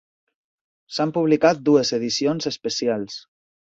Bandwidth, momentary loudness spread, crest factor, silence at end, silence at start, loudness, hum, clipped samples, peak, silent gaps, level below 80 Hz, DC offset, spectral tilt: 8 kHz; 12 LU; 20 dB; 0.55 s; 0.9 s; -21 LUFS; none; under 0.1%; -2 dBFS; none; -66 dBFS; under 0.1%; -4.5 dB/octave